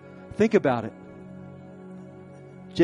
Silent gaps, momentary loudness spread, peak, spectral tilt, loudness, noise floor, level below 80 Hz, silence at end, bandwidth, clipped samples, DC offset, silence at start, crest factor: none; 23 LU; -6 dBFS; -7 dB/octave; -25 LUFS; -45 dBFS; -58 dBFS; 0 s; 10.5 kHz; under 0.1%; under 0.1%; 0.05 s; 22 dB